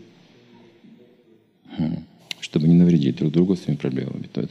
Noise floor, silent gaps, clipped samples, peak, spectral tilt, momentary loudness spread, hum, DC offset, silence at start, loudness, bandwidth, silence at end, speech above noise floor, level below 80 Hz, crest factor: -57 dBFS; none; under 0.1%; -6 dBFS; -8 dB/octave; 17 LU; none; under 0.1%; 1.7 s; -21 LUFS; 8 kHz; 0.05 s; 38 dB; -58 dBFS; 16 dB